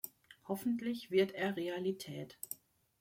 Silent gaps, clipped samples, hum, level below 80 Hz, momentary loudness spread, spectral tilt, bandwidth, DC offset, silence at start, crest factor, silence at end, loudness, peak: none; under 0.1%; none; -80 dBFS; 14 LU; -5 dB/octave; 16.5 kHz; under 0.1%; 0.05 s; 20 dB; 0.45 s; -38 LUFS; -20 dBFS